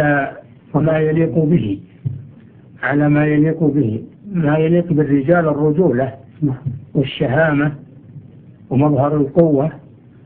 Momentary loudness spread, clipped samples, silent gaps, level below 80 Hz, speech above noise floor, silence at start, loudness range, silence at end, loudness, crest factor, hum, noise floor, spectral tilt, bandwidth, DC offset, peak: 11 LU; under 0.1%; none; -46 dBFS; 27 dB; 0 s; 3 LU; 0.45 s; -16 LUFS; 16 dB; none; -42 dBFS; -12.5 dB/octave; 3.8 kHz; under 0.1%; 0 dBFS